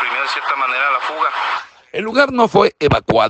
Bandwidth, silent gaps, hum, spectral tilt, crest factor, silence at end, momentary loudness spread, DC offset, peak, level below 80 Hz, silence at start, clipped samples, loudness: 8.8 kHz; none; none; -5.5 dB/octave; 16 dB; 0 s; 9 LU; under 0.1%; 0 dBFS; -44 dBFS; 0 s; under 0.1%; -16 LUFS